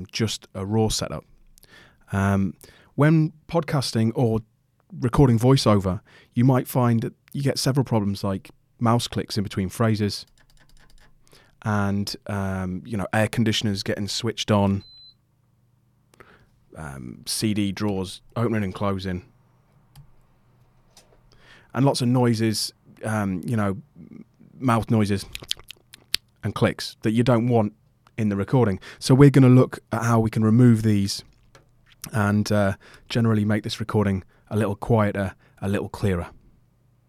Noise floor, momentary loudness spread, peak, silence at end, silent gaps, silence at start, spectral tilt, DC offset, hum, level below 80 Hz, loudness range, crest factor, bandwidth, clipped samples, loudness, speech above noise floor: -63 dBFS; 13 LU; 0 dBFS; 0.8 s; none; 0 s; -6 dB/octave; under 0.1%; none; -48 dBFS; 9 LU; 22 dB; 15.5 kHz; under 0.1%; -23 LUFS; 42 dB